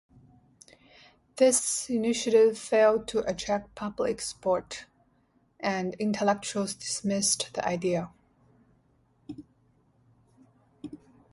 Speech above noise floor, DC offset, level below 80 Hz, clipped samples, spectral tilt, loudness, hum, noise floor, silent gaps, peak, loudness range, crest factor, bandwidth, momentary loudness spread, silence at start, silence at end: 41 dB; under 0.1%; -64 dBFS; under 0.1%; -3.5 dB/octave; -27 LUFS; none; -68 dBFS; none; -10 dBFS; 7 LU; 20 dB; 12 kHz; 23 LU; 1.35 s; 0.35 s